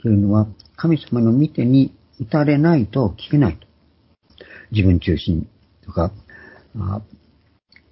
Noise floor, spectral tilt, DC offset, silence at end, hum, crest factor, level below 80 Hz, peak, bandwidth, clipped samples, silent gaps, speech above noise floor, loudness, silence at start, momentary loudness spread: -58 dBFS; -12.5 dB/octave; under 0.1%; 0.9 s; none; 16 dB; -36 dBFS; -2 dBFS; 5.8 kHz; under 0.1%; none; 41 dB; -19 LUFS; 0.05 s; 13 LU